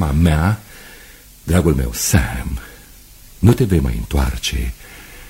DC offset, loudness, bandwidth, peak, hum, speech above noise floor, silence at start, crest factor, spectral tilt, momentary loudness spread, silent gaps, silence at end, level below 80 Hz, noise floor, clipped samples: under 0.1%; -18 LUFS; 16.5 kHz; 0 dBFS; none; 26 dB; 0 s; 18 dB; -5.5 dB/octave; 22 LU; none; 0 s; -24 dBFS; -42 dBFS; under 0.1%